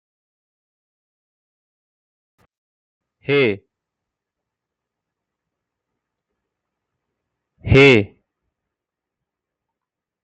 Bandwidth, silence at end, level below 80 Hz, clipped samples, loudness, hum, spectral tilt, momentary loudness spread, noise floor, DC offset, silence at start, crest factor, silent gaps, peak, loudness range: 8.4 kHz; 2.15 s; -44 dBFS; under 0.1%; -14 LUFS; none; -6.5 dB/octave; 22 LU; -85 dBFS; under 0.1%; 3.3 s; 22 dB; none; -2 dBFS; 7 LU